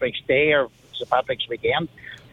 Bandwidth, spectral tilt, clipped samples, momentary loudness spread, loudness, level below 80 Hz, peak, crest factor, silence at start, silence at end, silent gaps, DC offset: 7.8 kHz; -6 dB/octave; under 0.1%; 16 LU; -22 LUFS; -54 dBFS; -4 dBFS; 20 dB; 0 s; 0.15 s; none; under 0.1%